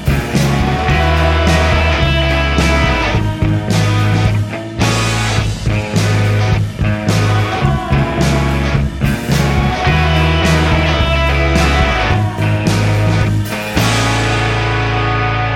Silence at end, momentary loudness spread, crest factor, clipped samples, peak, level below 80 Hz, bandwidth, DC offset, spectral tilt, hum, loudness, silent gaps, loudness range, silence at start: 0 s; 4 LU; 12 dB; under 0.1%; 0 dBFS; -20 dBFS; 16 kHz; under 0.1%; -5.5 dB/octave; none; -14 LUFS; none; 2 LU; 0 s